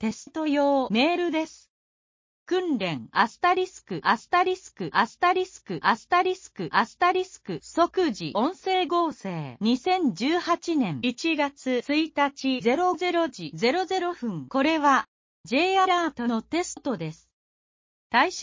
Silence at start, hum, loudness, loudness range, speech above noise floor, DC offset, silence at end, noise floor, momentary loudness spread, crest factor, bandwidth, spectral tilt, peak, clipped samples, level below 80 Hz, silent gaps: 0 s; none; -25 LUFS; 2 LU; over 65 dB; under 0.1%; 0 s; under -90 dBFS; 8 LU; 20 dB; 7.6 kHz; -4.5 dB/octave; -6 dBFS; under 0.1%; -66 dBFS; 1.70-2.46 s, 15.08-15.44 s, 17.33-18.10 s